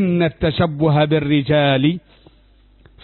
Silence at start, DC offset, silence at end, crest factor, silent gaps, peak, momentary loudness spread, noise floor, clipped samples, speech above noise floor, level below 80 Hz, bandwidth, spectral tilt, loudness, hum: 0 s; under 0.1%; 1.05 s; 14 dB; none; -4 dBFS; 4 LU; -51 dBFS; under 0.1%; 35 dB; -42 dBFS; 4.3 kHz; -12 dB/octave; -17 LUFS; none